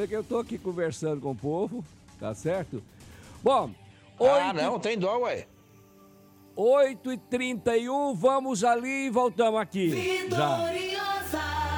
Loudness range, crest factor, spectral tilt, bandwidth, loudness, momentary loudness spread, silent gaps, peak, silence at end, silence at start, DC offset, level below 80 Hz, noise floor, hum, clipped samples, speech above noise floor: 5 LU; 16 dB; -5 dB/octave; 19.5 kHz; -27 LUFS; 10 LU; none; -12 dBFS; 0 s; 0 s; under 0.1%; -54 dBFS; -55 dBFS; none; under 0.1%; 28 dB